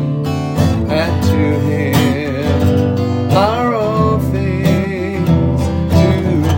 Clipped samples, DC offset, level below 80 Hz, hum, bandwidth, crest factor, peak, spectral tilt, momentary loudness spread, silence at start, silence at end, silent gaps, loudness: under 0.1%; under 0.1%; -34 dBFS; none; 17 kHz; 12 dB; 0 dBFS; -7.5 dB/octave; 4 LU; 0 s; 0 s; none; -14 LUFS